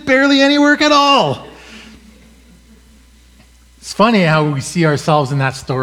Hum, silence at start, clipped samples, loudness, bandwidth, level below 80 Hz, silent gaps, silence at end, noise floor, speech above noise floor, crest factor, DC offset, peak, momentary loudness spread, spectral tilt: none; 0.05 s; under 0.1%; -12 LUFS; 13.5 kHz; -48 dBFS; none; 0 s; -46 dBFS; 33 dB; 14 dB; under 0.1%; 0 dBFS; 9 LU; -5 dB/octave